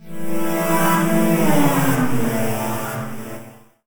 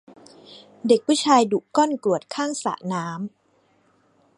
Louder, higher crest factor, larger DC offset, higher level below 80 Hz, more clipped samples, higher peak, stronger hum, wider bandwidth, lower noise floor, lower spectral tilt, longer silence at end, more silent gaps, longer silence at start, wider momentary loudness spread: first, -19 LUFS vs -22 LUFS; second, 14 dB vs 20 dB; neither; first, -50 dBFS vs -72 dBFS; neither; about the same, -4 dBFS vs -4 dBFS; neither; first, over 20 kHz vs 11.5 kHz; second, -40 dBFS vs -63 dBFS; about the same, -5.5 dB/octave vs -4.5 dB/octave; second, 0.35 s vs 1.1 s; neither; second, 0 s vs 0.5 s; about the same, 13 LU vs 14 LU